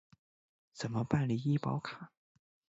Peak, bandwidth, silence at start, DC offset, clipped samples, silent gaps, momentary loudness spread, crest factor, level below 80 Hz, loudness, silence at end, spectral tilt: -14 dBFS; 8 kHz; 0.75 s; under 0.1%; under 0.1%; none; 15 LU; 24 dB; -68 dBFS; -35 LUFS; 0.65 s; -7 dB/octave